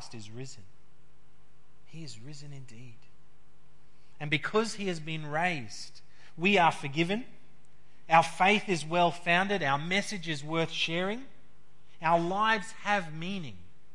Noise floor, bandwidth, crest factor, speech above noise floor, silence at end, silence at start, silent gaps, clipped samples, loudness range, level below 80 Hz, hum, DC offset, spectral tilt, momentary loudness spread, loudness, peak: -65 dBFS; 11.5 kHz; 24 dB; 35 dB; 0.35 s; 0 s; none; under 0.1%; 9 LU; -70 dBFS; none; 1%; -4.5 dB/octave; 21 LU; -29 LUFS; -8 dBFS